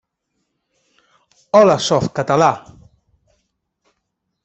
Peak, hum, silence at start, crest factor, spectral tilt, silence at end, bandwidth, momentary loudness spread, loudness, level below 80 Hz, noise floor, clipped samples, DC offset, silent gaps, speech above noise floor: -2 dBFS; none; 1.55 s; 18 dB; -5 dB/octave; 1.85 s; 8.2 kHz; 6 LU; -15 LUFS; -56 dBFS; -74 dBFS; under 0.1%; under 0.1%; none; 60 dB